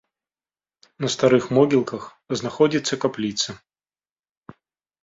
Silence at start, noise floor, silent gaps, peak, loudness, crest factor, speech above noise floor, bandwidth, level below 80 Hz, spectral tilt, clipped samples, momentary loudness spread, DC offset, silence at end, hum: 1 s; under -90 dBFS; none; -4 dBFS; -21 LUFS; 20 dB; over 69 dB; 7.8 kHz; -62 dBFS; -5 dB/octave; under 0.1%; 12 LU; under 0.1%; 1.45 s; none